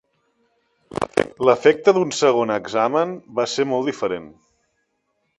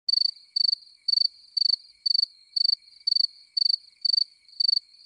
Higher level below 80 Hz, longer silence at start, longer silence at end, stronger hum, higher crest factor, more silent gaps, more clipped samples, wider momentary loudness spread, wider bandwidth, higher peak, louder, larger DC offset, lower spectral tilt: first, -58 dBFS vs -76 dBFS; first, 0.95 s vs 0.1 s; first, 1.1 s vs 0.25 s; neither; first, 20 dB vs 14 dB; neither; neither; first, 11 LU vs 4 LU; about the same, 11.5 kHz vs 10.5 kHz; first, 0 dBFS vs -12 dBFS; first, -20 LUFS vs -23 LUFS; neither; first, -4.5 dB/octave vs 3 dB/octave